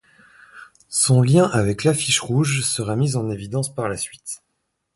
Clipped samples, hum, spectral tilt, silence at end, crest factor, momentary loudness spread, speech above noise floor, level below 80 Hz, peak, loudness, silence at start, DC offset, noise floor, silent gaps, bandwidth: under 0.1%; none; -4.5 dB/octave; 0.6 s; 18 dB; 13 LU; 55 dB; -50 dBFS; -2 dBFS; -20 LUFS; 0.55 s; under 0.1%; -74 dBFS; none; 12 kHz